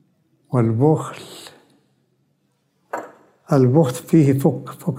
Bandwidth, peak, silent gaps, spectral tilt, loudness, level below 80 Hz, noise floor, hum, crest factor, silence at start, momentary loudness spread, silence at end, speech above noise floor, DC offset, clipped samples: 16 kHz; -2 dBFS; none; -8 dB/octave; -18 LUFS; -64 dBFS; -66 dBFS; none; 18 dB; 0.5 s; 18 LU; 0 s; 50 dB; under 0.1%; under 0.1%